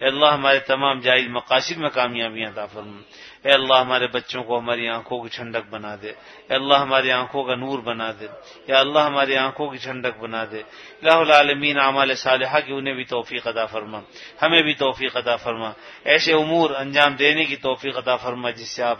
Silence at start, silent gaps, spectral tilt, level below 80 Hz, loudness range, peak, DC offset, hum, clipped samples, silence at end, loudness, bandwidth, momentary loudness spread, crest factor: 0 s; none; -4 dB/octave; -64 dBFS; 4 LU; 0 dBFS; under 0.1%; none; under 0.1%; 0 s; -20 LUFS; 9.8 kHz; 16 LU; 22 dB